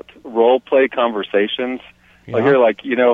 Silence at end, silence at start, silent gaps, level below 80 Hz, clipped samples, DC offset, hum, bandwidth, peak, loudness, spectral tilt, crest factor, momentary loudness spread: 0 s; 0.25 s; none; -60 dBFS; under 0.1%; under 0.1%; none; 4.4 kHz; -2 dBFS; -17 LUFS; -7.5 dB/octave; 16 dB; 11 LU